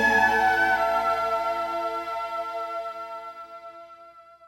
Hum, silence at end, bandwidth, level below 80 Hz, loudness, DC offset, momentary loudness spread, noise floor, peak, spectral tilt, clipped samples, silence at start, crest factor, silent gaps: none; 0.25 s; 16.5 kHz; -56 dBFS; -24 LUFS; under 0.1%; 21 LU; -49 dBFS; -8 dBFS; -3.5 dB/octave; under 0.1%; 0 s; 18 dB; none